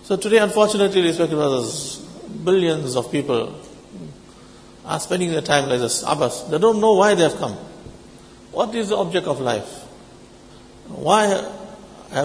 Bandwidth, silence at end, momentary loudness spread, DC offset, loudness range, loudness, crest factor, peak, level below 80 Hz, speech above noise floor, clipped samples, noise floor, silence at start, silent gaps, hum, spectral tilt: 11 kHz; 0 s; 22 LU; under 0.1%; 6 LU; -19 LUFS; 20 dB; 0 dBFS; -54 dBFS; 25 dB; under 0.1%; -44 dBFS; 0.05 s; none; none; -4.5 dB/octave